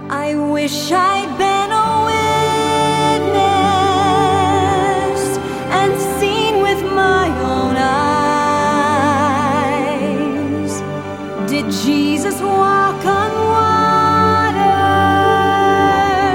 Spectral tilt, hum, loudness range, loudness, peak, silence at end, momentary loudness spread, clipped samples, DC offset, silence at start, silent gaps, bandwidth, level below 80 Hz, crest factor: -5 dB/octave; none; 4 LU; -15 LUFS; -2 dBFS; 0 s; 6 LU; under 0.1%; under 0.1%; 0 s; none; 17.5 kHz; -42 dBFS; 12 dB